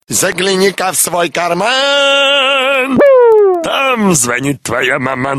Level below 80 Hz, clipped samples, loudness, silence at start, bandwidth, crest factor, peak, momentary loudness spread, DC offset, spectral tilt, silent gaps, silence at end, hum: -52 dBFS; under 0.1%; -10 LUFS; 0.1 s; 13.5 kHz; 10 dB; 0 dBFS; 7 LU; under 0.1%; -2.5 dB/octave; none; 0 s; none